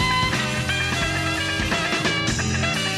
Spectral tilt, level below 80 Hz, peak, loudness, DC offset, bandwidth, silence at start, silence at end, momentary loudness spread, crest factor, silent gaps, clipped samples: -3.5 dB/octave; -38 dBFS; -10 dBFS; -21 LUFS; under 0.1%; 15.5 kHz; 0 s; 0 s; 2 LU; 14 dB; none; under 0.1%